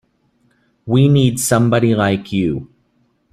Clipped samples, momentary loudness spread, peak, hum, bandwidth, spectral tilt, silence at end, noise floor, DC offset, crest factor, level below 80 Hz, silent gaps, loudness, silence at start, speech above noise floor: under 0.1%; 9 LU; -2 dBFS; none; 15 kHz; -6 dB/octave; 0.7 s; -61 dBFS; under 0.1%; 14 dB; -48 dBFS; none; -15 LUFS; 0.85 s; 47 dB